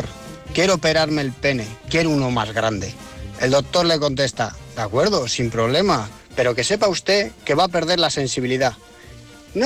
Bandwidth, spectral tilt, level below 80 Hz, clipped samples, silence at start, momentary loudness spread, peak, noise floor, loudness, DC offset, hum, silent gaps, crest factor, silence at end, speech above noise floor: 16 kHz; -4 dB/octave; -44 dBFS; under 0.1%; 0 s; 10 LU; -6 dBFS; -42 dBFS; -20 LUFS; under 0.1%; none; none; 14 dB; 0 s; 22 dB